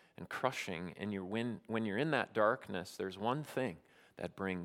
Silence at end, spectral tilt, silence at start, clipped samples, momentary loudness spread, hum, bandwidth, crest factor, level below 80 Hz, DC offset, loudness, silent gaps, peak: 0 s; -5.5 dB/octave; 0.2 s; under 0.1%; 10 LU; none; 16.5 kHz; 22 dB; -76 dBFS; under 0.1%; -38 LUFS; none; -16 dBFS